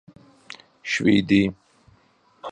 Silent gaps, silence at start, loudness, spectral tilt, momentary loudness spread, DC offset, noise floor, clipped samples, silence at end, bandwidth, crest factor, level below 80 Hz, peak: none; 0.85 s; -21 LUFS; -5.5 dB/octave; 24 LU; under 0.1%; -60 dBFS; under 0.1%; 0 s; 9.6 kHz; 18 dB; -54 dBFS; -6 dBFS